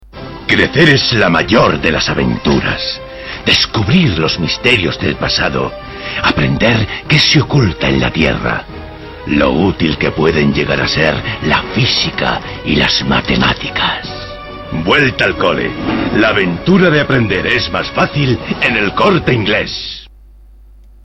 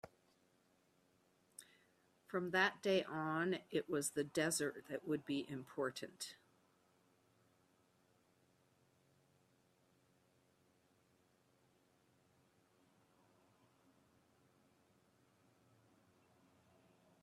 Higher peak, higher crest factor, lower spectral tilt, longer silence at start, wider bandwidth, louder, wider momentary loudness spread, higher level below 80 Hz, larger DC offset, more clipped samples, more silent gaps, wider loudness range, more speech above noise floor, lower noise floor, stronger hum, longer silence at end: first, 0 dBFS vs -20 dBFS; second, 12 dB vs 28 dB; first, -5.5 dB/octave vs -3.5 dB/octave; about the same, 0.15 s vs 0.05 s; second, 9.4 kHz vs 14 kHz; first, -12 LUFS vs -41 LUFS; second, 11 LU vs 15 LU; first, -32 dBFS vs -86 dBFS; first, 0.2% vs under 0.1%; neither; neither; second, 2 LU vs 12 LU; second, 26 dB vs 36 dB; second, -39 dBFS vs -77 dBFS; neither; second, 0.95 s vs 10.9 s